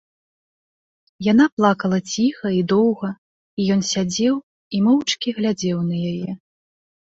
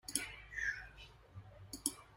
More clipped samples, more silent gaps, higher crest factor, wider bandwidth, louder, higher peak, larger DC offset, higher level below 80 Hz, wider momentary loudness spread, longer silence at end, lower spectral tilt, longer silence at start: neither; first, 1.52-1.57 s, 3.18-3.57 s, 4.43-4.71 s vs none; second, 18 dB vs 32 dB; second, 8 kHz vs 16 kHz; first, -20 LUFS vs -42 LUFS; first, -2 dBFS vs -14 dBFS; neither; about the same, -60 dBFS vs -62 dBFS; second, 12 LU vs 17 LU; first, 0.65 s vs 0 s; first, -5.5 dB/octave vs -1 dB/octave; first, 1.2 s vs 0.05 s